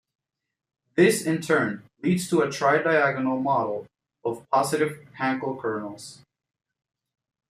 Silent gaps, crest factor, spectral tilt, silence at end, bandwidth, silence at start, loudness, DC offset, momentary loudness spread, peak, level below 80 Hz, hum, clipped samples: none; 18 dB; -5 dB/octave; 1.35 s; 15 kHz; 0.95 s; -24 LUFS; under 0.1%; 12 LU; -6 dBFS; -70 dBFS; none; under 0.1%